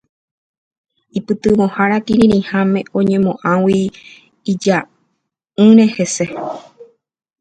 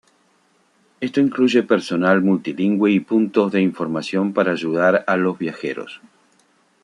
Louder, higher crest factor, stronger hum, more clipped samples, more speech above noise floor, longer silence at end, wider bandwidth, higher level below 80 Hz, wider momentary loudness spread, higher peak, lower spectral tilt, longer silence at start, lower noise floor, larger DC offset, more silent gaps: first, -14 LUFS vs -19 LUFS; about the same, 16 dB vs 18 dB; neither; neither; first, 57 dB vs 42 dB; second, 0.6 s vs 0.85 s; second, 9.2 kHz vs 11 kHz; first, -50 dBFS vs -66 dBFS; first, 16 LU vs 9 LU; about the same, 0 dBFS vs -2 dBFS; about the same, -6 dB/octave vs -7 dB/octave; first, 1.15 s vs 1 s; first, -71 dBFS vs -60 dBFS; neither; neither